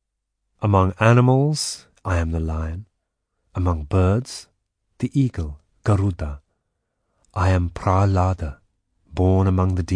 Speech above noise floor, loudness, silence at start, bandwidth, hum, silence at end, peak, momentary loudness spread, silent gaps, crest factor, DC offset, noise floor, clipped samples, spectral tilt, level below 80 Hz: 58 dB; -21 LUFS; 0.6 s; 10.5 kHz; none; 0 s; -2 dBFS; 16 LU; none; 20 dB; under 0.1%; -77 dBFS; under 0.1%; -7 dB/octave; -36 dBFS